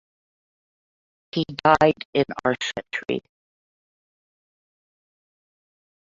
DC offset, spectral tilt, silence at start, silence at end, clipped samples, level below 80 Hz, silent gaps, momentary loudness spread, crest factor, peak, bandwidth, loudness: under 0.1%; -5.5 dB/octave; 1.35 s; 2.95 s; under 0.1%; -60 dBFS; 2.05-2.13 s; 12 LU; 24 dB; -2 dBFS; 7.8 kHz; -23 LUFS